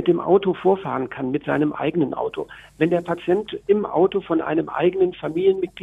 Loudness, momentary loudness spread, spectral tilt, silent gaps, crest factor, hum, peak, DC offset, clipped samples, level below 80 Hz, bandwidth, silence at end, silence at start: -21 LUFS; 8 LU; -8.5 dB/octave; none; 16 dB; none; -4 dBFS; under 0.1%; under 0.1%; -56 dBFS; 3.9 kHz; 0 s; 0 s